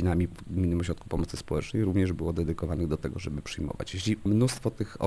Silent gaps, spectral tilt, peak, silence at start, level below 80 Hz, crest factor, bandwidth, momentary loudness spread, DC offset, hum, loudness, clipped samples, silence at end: none; -6.5 dB/octave; -12 dBFS; 0 s; -42 dBFS; 16 dB; 11 kHz; 9 LU; under 0.1%; none; -30 LUFS; under 0.1%; 0 s